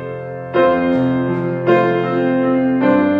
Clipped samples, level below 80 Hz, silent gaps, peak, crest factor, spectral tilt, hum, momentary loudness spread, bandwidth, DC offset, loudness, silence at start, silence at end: under 0.1%; -52 dBFS; none; -2 dBFS; 14 dB; -9.5 dB/octave; none; 6 LU; 5.2 kHz; under 0.1%; -16 LUFS; 0 s; 0 s